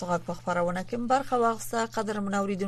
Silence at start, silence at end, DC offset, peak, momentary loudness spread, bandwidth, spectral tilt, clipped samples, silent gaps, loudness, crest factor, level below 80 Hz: 0 s; 0 s; under 0.1%; -12 dBFS; 5 LU; 13.5 kHz; -5.5 dB/octave; under 0.1%; none; -28 LUFS; 16 dB; -54 dBFS